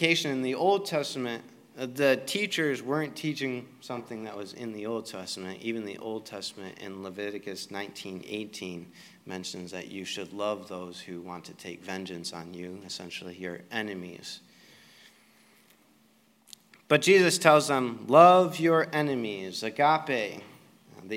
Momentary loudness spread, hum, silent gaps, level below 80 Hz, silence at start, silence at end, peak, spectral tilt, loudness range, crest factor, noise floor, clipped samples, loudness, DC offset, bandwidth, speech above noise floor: 19 LU; none; none; -80 dBFS; 0 s; 0 s; -2 dBFS; -4 dB/octave; 17 LU; 26 dB; -64 dBFS; under 0.1%; -28 LUFS; under 0.1%; 16 kHz; 36 dB